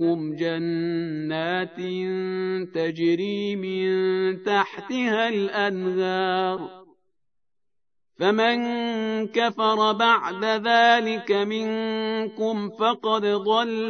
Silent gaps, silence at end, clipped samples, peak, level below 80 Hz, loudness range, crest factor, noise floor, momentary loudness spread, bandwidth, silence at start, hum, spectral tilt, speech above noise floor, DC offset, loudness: none; 0 s; under 0.1%; -4 dBFS; -78 dBFS; 5 LU; 20 dB; -85 dBFS; 8 LU; 6.6 kHz; 0 s; none; -5.5 dB/octave; 62 dB; under 0.1%; -24 LUFS